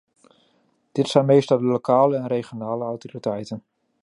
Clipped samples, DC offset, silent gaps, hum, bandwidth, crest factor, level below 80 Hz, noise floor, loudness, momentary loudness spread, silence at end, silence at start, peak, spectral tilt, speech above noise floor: under 0.1%; under 0.1%; none; none; 11 kHz; 20 dB; -70 dBFS; -65 dBFS; -21 LUFS; 13 LU; 0.45 s; 0.95 s; -2 dBFS; -7 dB/octave; 44 dB